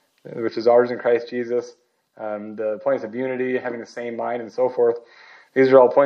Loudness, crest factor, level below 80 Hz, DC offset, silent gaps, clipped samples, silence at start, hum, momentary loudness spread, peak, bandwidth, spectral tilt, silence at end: -21 LUFS; 20 dB; -82 dBFS; under 0.1%; none; under 0.1%; 0.25 s; none; 14 LU; 0 dBFS; 6.6 kHz; -7 dB/octave; 0 s